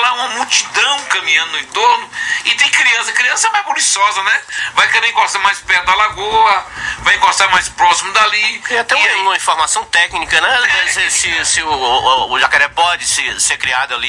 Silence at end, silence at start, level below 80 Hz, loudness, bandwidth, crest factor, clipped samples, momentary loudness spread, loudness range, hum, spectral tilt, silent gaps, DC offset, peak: 0 s; 0 s; -46 dBFS; -12 LUFS; 11.5 kHz; 14 dB; under 0.1%; 4 LU; 1 LU; none; 1 dB/octave; none; under 0.1%; 0 dBFS